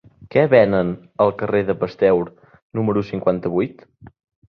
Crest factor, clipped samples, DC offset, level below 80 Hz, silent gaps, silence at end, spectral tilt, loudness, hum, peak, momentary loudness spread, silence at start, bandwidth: 18 dB; under 0.1%; under 0.1%; -52 dBFS; 2.62-2.70 s; 0.45 s; -9.5 dB/octave; -19 LUFS; none; -2 dBFS; 10 LU; 0.2 s; 6 kHz